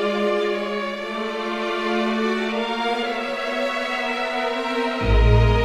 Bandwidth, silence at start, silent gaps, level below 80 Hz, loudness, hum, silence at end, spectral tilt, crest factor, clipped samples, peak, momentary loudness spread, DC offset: 11 kHz; 0 s; none; -28 dBFS; -22 LUFS; none; 0 s; -6 dB/octave; 16 dB; under 0.1%; -4 dBFS; 7 LU; under 0.1%